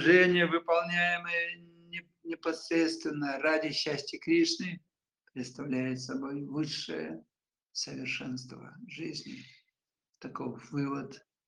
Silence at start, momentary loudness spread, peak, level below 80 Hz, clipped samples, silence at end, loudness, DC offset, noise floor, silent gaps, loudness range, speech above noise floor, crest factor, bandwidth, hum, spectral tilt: 0 s; 19 LU; -10 dBFS; -76 dBFS; under 0.1%; 0.3 s; -31 LUFS; under 0.1%; -85 dBFS; none; 9 LU; 54 dB; 22 dB; 11 kHz; none; -4.5 dB/octave